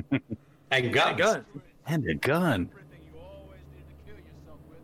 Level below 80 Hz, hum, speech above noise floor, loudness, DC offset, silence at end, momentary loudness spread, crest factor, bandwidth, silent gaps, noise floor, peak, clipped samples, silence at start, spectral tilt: -56 dBFS; none; 23 dB; -27 LUFS; under 0.1%; 0.05 s; 25 LU; 18 dB; 16 kHz; none; -49 dBFS; -12 dBFS; under 0.1%; 0 s; -5 dB/octave